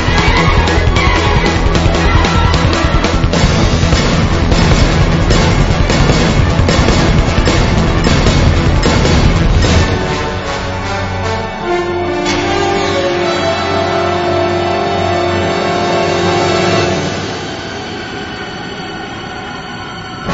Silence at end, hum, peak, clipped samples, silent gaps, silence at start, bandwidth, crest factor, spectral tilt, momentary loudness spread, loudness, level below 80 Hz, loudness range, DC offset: 0 s; none; 0 dBFS; under 0.1%; none; 0 s; 8 kHz; 12 dB; -5.5 dB/octave; 11 LU; -12 LUFS; -18 dBFS; 4 LU; under 0.1%